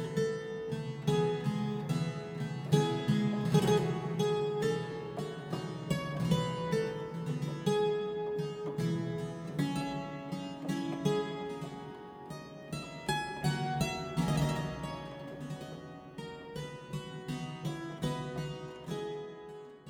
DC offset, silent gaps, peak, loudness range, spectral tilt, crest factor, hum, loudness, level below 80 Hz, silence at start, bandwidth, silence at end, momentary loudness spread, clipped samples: under 0.1%; none; -12 dBFS; 9 LU; -6.5 dB/octave; 22 dB; none; -35 LUFS; -60 dBFS; 0 s; 17.5 kHz; 0 s; 13 LU; under 0.1%